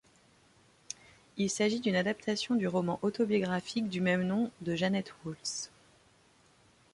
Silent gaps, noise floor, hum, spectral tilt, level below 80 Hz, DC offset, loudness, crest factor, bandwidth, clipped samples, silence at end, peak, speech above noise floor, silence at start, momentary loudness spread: none; -65 dBFS; none; -5 dB/octave; -70 dBFS; under 0.1%; -32 LUFS; 18 dB; 11.5 kHz; under 0.1%; 1.25 s; -16 dBFS; 33 dB; 1.35 s; 15 LU